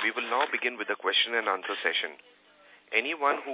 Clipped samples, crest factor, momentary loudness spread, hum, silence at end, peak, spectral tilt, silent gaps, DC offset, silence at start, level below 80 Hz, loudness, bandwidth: under 0.1%; 20 dB; 6 LU; none; 0 s; -10 dBFS; 3 dB/octave; none; under 0.1%; 0 s; under -90 dBFS; -28 LUFS; 4 kHz